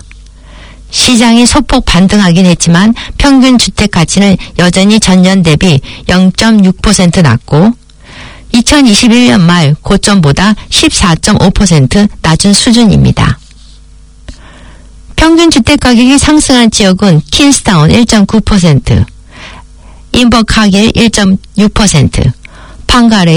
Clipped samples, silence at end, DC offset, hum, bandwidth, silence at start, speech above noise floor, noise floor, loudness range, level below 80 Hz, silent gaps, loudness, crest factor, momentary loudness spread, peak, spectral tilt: 4%; 0 s; under 0.1%; none; 18.5 kHz; 0.15 s; 28 dB; -33 dBFS; 3 LU; -22 dBFS; none; -6 LUFS; 6 dB; 5 LU; 0 dBFS; -4.5 dB/octave